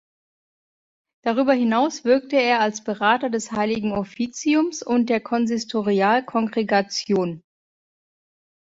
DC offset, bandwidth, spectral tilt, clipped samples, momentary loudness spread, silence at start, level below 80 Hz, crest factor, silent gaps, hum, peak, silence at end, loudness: under 0.1%; 7.8 kHz; -4.5 dB/octave; under 0.1%; 6 LU; 1.25 s; -62 dBFS; 18 dB; none; none; -4 dBFS; 1.25 s; -21 LUFS